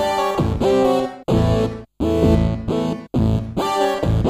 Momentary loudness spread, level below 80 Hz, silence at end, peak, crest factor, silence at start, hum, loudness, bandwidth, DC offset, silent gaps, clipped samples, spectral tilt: 6 LU; -30 dBFS; 0 s; -2 dBFS; 16 dB; 0 s; none; -19 LUFS; 15.5 kHz; under 0.1%; none; under 0.1%; -7 dB/octave